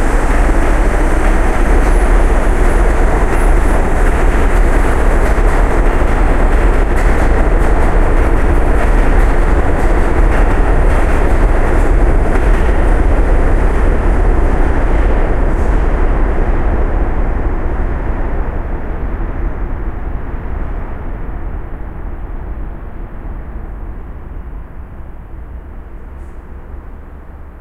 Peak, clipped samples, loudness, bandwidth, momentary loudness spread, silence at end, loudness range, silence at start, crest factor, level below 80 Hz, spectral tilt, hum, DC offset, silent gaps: 0 dBFS; under 0.1%; -15 LUFS; 11 kHz; 17 LU; 0 s; 15 LU; 0 s; 10 dB; -12 dBFS; -7 dB/octave; none; under 0.1%; none